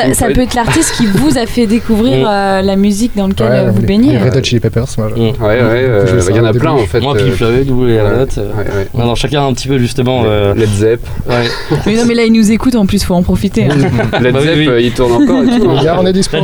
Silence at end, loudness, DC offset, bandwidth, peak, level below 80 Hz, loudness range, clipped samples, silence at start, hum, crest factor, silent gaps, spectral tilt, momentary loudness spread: 0 s; -11 LUFS; under 0.1%; over 20 kHz; 0 dBFS; -24 dBFS; 2 LU; under 0.1%; 0 s; none; 10 dB; none; -6 dB/octave; 5 LU